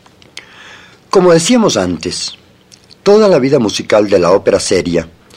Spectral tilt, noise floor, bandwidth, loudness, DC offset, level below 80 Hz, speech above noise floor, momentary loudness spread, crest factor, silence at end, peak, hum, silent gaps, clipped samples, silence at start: -4.5 dB/octave; -44 dBFS; 15 kHz; -11 LUFS; under 0.1%; -46 dBFS; 34 dB; 10 LU; 12 dB; 0.3 s; 0 dBFS; none; none; under 0.1%; 0.35 s